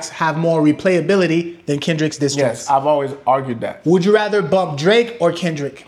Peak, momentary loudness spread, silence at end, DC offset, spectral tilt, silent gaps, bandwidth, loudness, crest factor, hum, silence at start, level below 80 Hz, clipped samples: -2 dBFS; 6 LU; 0.05 s; under 0.1%; -5.5 dB/octave; none; 12.5 kHz; -17 LUFS; 16 dB; none; 0 s; -62 dBFS; under 0.1%